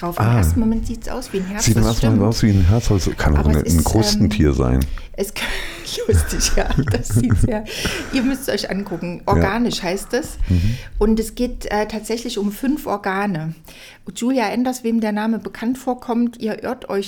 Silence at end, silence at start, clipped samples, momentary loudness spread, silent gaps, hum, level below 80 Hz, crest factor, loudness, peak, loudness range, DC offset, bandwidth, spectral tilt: 0 s; 0 s; under 0.1%; 9 LU; none; none; -26 dBFS; 14 dB; -19 LUFS; -4 dBFS; 5 LU; under 0.1%; over 20 kHz; -5.5 dB/octave